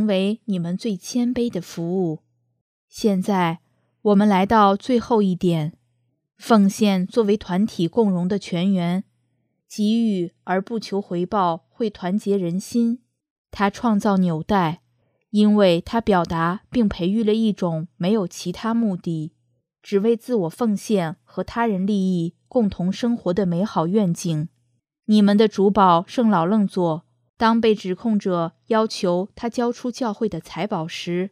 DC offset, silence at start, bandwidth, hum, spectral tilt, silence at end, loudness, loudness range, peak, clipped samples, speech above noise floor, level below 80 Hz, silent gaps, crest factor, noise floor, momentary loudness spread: under 0.1%; 0 s; 14 kHz; none; -6.5 dB/octave; 0.05 s; -21 LUFS; 5 LU; -2 dBFS; under 0.1%; 50 dB; -52 dBFS; 2.61-2.88 s, 13.30-13.45 s, 27.29-27.34 s; 18 dB; -70 dBFS; 10 LU